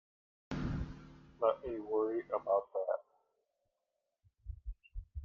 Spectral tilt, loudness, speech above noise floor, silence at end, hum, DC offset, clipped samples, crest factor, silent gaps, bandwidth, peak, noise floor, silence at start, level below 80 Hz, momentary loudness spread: -8.5 dB/octave; -37 LUFS; 52 dB; 0 s; none; under 0.1%; under 0.1%; 22 dB; none; 7 kHz; -18 dBFS; -87 dBFS; 0.5 s; -52 dBFS; 18 LU